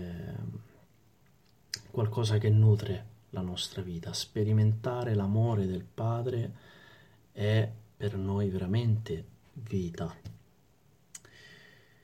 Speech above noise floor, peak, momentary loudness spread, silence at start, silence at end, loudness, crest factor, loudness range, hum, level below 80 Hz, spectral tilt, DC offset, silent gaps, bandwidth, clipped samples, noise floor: 36 dB; -14 dBFS; 22 LU; 0 s; 0.5 s; -31 LUFS; 18 dB; 5 LU; none; -60 dBFS; -7 dB/octave; under 0.1%; none; 9.4 kHz; under 0.1%; -65 dBFS